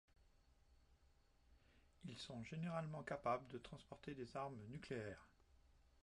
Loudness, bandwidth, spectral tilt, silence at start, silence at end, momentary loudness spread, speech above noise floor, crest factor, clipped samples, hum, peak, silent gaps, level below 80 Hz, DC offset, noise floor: -50 LUFS; 11 kHz; -6.5 dB/octave; 0.2 s; 0 s; 12 LU; 25 dB; 22 dB; under 0.1%; none; -30 dBFS; none; -74 dBFS; under 0.1%; -75 dBFS